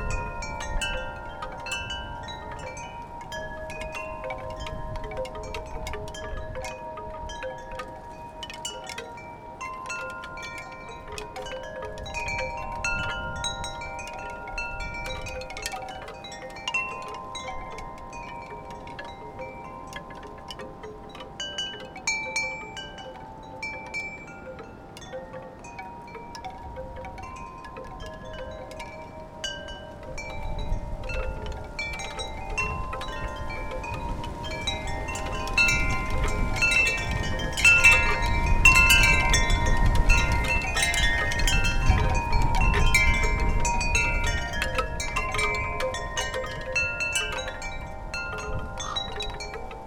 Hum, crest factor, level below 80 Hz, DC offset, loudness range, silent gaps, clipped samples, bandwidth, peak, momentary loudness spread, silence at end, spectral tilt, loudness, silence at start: none; 24 dB; -32 dBFS; under 0.1%; 18 LU; none; under 0.1%; 19 kHz; -4 dBFS; 18 LU; 0 s; -3 dB/octave; -26 LUFS; 0 s